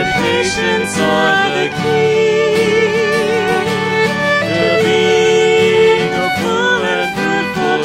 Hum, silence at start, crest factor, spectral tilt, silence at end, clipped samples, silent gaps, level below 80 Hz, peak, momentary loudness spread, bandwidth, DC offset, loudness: none; 0 s; 12 dB; -4 dB/octave; 0 s; under 0.1%; none; -46 dBFS; 0 dBFS; 5 LU; 15.5 kHz; under 0.1%; -13 LUFS